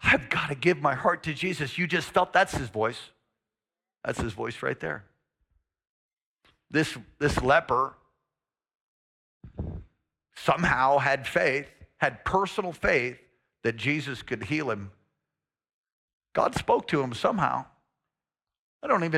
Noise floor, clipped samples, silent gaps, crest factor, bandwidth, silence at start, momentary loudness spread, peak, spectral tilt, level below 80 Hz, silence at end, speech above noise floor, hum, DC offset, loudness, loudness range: under -90 dBFS; under 0.1%; 5.89-6.09 s, 6.26-6.34 s, 8.81-9.41 s, 15.73-15.84 s, 15.93-16.20 s, 18.59-18.80 s; 20 dB; 15.5 kHz; 0 s; 13 LU; -10 dBFS; -5 dB/octave; -52 dBFS; 0 s; over 63 dB; none; under 0.1%; -27 LUFS; 7 LU